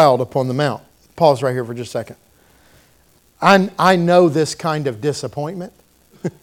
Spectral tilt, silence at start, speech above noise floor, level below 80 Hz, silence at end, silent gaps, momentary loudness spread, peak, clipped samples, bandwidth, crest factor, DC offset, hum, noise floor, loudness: -5.5 dB/octave; 0 s; 38 dB; -58 dBFS; 0.15 s; none; 16 LU; 0 dBFS; under 0.1%; 17 kHz; 18 dB; under 0.1%; none; -55 dBFS; -17 LUFS